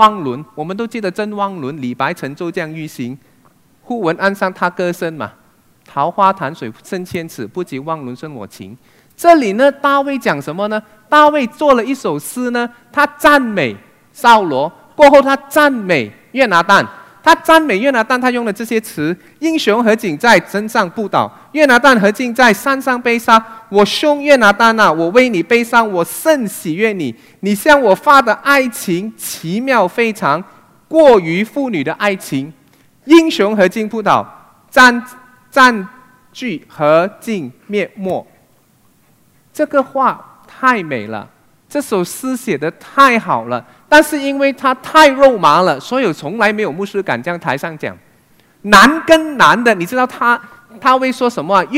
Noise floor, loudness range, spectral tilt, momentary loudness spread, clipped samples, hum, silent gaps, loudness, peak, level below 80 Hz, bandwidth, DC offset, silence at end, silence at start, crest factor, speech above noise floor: -53 dBFS; 9 LU; -4.5 dB/octave; 15 LU; 0.4%; none; none; -13 LUFS; 0 dBFS; -50 dBFS; 16.5 kHz; under 0.1%; 0 s; 0 s; 14 dB; 40 dB